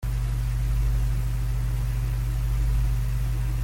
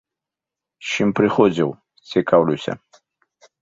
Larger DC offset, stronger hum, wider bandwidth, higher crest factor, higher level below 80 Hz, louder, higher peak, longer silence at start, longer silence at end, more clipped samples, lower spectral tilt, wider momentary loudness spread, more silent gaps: neither; neither; first, 16.5 kHz vs 7.8 kHz; second, 10 dB vs 20 dB; first, -26 dBFS vs -58 dBFS; second, -27 LUFS vs -19 LUFS; second, -14 dBFS vs 0 dBFS; second, 0 s vs 0.8 s; second, 0 s vs 0.85 s; neither; about the same, -6.5 dB/octave vs -6 dB/octave; second, 2 LU vs 13 LU; neither